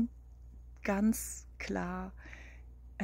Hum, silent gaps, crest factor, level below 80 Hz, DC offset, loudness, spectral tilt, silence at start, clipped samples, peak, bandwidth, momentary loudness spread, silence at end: none; none; 18 dB; -50 dBFS; under 0.1%; -36 LUFS; -5.5 dB/octave; 0 s; under 0.1%; -20 dBFS; 16 kHz; 23 LU; 0 s